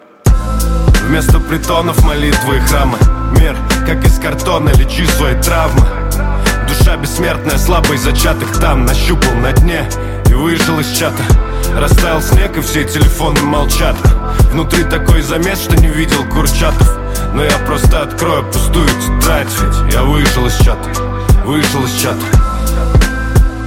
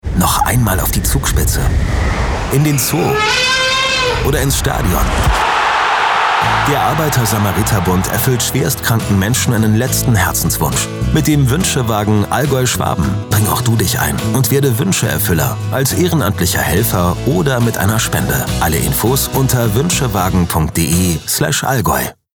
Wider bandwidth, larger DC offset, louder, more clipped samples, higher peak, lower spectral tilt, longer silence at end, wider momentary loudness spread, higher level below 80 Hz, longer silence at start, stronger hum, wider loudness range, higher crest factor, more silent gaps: second, 17 kHz vs over 20 kHz; neither; about the same, -12 LUFS vs -14 LUFS; neither; about the same, 0 dBFS vs -2 dBFS; about the same, -5 dB/octave vs -4.5 dB/octave; second, 0 s vs 0.25 s; about the same, 3 LU vs 3 LU; first, -14 dBFS vs -24 dBFS; first, 0.25 s vs 0.05 s; neither; about the same, 1 LU vs 1 LU; about the same, 10 dB vs 12 dB; neither